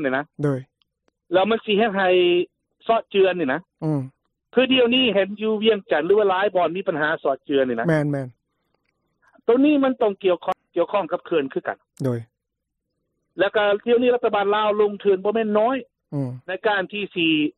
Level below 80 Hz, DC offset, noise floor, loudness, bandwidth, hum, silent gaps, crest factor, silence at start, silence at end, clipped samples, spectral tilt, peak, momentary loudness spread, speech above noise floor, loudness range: -66 dBFS; under 0.1%; -80 dBFS; -21 LUFS; 9.8 kHz; none; none; 14 dB; 0 s; 0.05 s; under 0.1%; -7.5 dB/octave; -6 dBFS; 11 LU; 60 dB; 4 LU